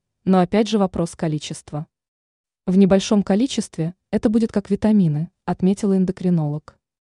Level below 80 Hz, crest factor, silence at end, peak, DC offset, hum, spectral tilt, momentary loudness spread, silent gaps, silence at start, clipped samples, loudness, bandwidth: -50 dBFS; 16 dB; 0.5 s; -4 dBFS; under 0.1%; none; -7 dB/octave; 13 LU; 2.08-2.44 s; 0.25 s; under 0.1%; -20 LUFS; 11 kHz